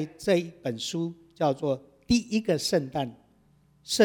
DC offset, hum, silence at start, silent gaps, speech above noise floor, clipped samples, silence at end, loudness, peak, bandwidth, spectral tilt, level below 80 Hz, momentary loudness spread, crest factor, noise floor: under 0.1%; none; 0 s; none; 35 dB; under 0.1%; 0 s; -28 LUFS; -6 dBFS; 19 kHz; -4.5 dB/octave; -56 dBFS; 9 LU; 20 dB; -62 dBFS